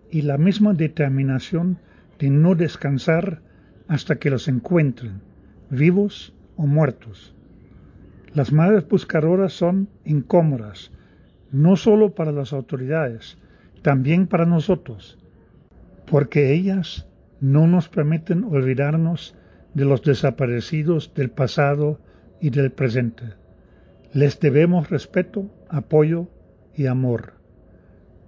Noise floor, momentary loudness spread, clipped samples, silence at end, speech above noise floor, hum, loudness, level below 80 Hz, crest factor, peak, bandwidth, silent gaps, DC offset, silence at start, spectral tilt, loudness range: -51 dBFS; 13 LU; under 0.1%; 1 s; 32 dB; none; -20 LUFS; -52 dBFS; 16 dB; -4 dBFS; 7.2 kHz; none; under 0.1%; 0.1 s; -8.5 dB/octave; 3 LU